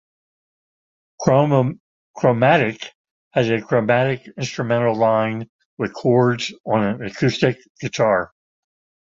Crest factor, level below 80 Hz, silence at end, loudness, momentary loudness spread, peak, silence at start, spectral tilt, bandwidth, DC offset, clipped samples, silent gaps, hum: 18 dB; -56 dBFS; 0.8 s; -19 LUFS; 13 LU; -2 dBFS; 1.2 s; -6.5 dB/octave; 7.8 kHz; under 0.1%; under 0.1%; 1.80-2.14 s, 2.95-3.04 s, 3.11-3.31 s, 5.49-5.59 s, 5.65-5.77 s, 6.60-6.64 s, 7.70-7.75 s; none